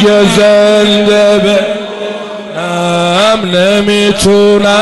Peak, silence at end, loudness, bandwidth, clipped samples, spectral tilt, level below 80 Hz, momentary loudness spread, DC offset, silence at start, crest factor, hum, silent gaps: 0 dBFS; 0 s; -8 LUFS; 12 kHz; under 0.1%; -4.5 dB/octave; -38 dBFS; 12 LU; under 0.1%; 0 s; 8 dB; none; none